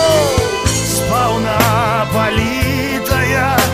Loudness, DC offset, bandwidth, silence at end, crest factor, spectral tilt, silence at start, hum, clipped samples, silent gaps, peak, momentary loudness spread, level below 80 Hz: -14 LUFS; under 0.1%; 16 kHz; 0 s; 14 dB; -4 dB/octave; 0 s; none; under 0.1%; none; 0 dBFS; 3 LU; -30 dBFS